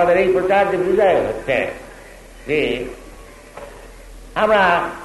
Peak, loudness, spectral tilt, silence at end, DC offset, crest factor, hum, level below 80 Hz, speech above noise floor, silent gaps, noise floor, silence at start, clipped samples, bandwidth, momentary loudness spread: -2 dBFS; -17 LUFS; -5.5 dB/octave; 0 s; under 0.1%; 16 dB; none; -42 dBFS; 23 dB; none; -40 dBFS; 0 s; under 0.1%; 12 kHz; 23 LU